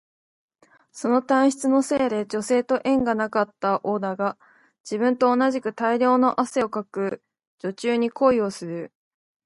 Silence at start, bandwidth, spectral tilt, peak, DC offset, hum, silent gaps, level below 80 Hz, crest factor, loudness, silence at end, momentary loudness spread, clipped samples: 0.95 s; 11.5 kHz; -5 dB/octave; -6 dBFS; under 0.1%; none; 4.80-4.84 s, 7.47-7.58 s; -64 dBFS; 18 dB; -23 LUFS; 0.6 s; 11 LU; under 0.1%